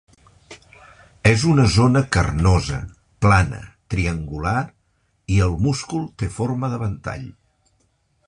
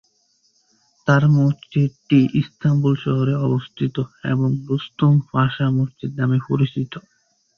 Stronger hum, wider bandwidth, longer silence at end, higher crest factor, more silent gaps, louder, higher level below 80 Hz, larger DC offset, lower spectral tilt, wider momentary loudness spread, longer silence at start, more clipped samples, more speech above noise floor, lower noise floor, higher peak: neither; first, 11 kHz vs 6.6 kHz; first, 0.95 s vs 0.6 s; about the same, 20 dB vs 18 dB; neither; about the same, -20 LUFS vs -20 LUFS; first, -32 dBFS vs -56 dBFS; neither; second, -6 dB/octave vs -8.5 dB/octave; first, 16 LU vs 9 LU; second, 0.5 s vs 1.05 s; neither; about the same, 47 dB vs 45 dB; about the same, -65 dBFS vs -63 dBFS; about the same, -2 dBFS vs -2 dBFS